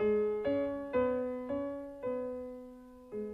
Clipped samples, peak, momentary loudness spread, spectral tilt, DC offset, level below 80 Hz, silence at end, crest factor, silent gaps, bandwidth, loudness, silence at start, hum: under 0.1%; -20 dBFS; 15 LU; -8 dB/octave; under 0.1%; -62 dBFS; 0 s; 14 dB; none; 4.9 kHz; -35 LUFS; 0 s; none